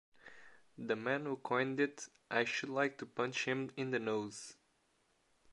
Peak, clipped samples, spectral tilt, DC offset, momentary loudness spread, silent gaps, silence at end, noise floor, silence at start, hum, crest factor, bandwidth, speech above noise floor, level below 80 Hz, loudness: -18 dBFS; under 0.1%; -4.5 dB/octave; under 0.1%; 15 LU; none; 0 s; -76 dBFS; 0.25 s; none; 22 dB; 11.5 kHz; 38 dB; -84 dBFS; -38 LUFS